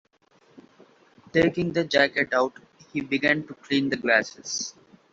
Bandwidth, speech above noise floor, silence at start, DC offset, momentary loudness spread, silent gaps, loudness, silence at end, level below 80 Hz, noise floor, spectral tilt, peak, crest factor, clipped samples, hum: 7.8 kHz; 37 dB; 1.35 s; under 0.1%; 9 LU; none; -24 LUFS; 0.4 s; -60 dBFS; -61 dBFS; -4 dB/octave; -6 dBFS; 20 dB; under 0.1%; none